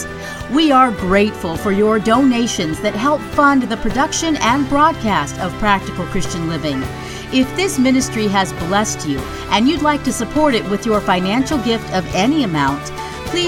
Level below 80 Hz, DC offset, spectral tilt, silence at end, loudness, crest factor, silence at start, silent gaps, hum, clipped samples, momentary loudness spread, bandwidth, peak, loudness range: -34 dBFS; under 0.1%; -4.5 dB/octave; 0 s; -16 LUFS; 16 dB; 0 s; none; none; under 0.1%; 8 LU; 16.5 kHz; 0 dBFS; 3 LU